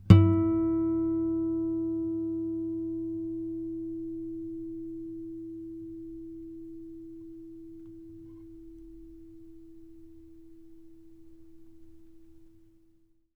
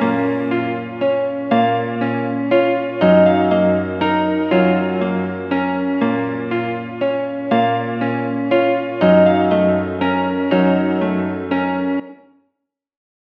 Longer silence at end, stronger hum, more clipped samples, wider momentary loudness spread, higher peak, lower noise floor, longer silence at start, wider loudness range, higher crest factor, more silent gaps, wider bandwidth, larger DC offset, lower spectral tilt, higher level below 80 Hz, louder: second, 0.9 s vs 1.2 s; neither; neither; first, 23 LU vs 8 LU; about the same, -2 dBFS vs 0 dBFS; second, -64 dBFS vs -75 dBFS; about the same, 0 s vs 0 s; first, 23 LU vs 4 LU; first, 28 dB vs 16 dB; neither; about the same, 5.2 kHz vs 5.4 kHz; neither; about the same, -10 dB/octave vs -9.5 dB/octave; first, -50 dBFS vs -58 dBFS; second, -30 LUFS vs -17 LUFS